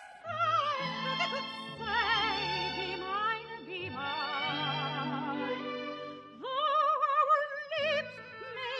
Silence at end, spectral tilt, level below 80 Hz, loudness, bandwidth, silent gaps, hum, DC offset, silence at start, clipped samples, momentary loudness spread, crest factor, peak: 0 s; -4.5 dB/octave; -66 dBFS; -32 LUFS; 10 kHz; none; none; under 0.1%; 0 s; under 0.1%; 12 LU; 16 dB; -16 dBFS